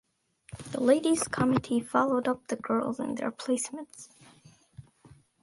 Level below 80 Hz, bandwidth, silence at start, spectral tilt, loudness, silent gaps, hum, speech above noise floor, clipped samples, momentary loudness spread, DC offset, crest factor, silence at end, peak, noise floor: -62 dBFS; 11.5 kHz; 0.5 s; -5 dB/octave; -28 LUFS; none; none; 33 dB; under 0.1%; 21 LU; under 0.1%; 20 dB; 0.6 s; -10 dBFS; -61 dBFS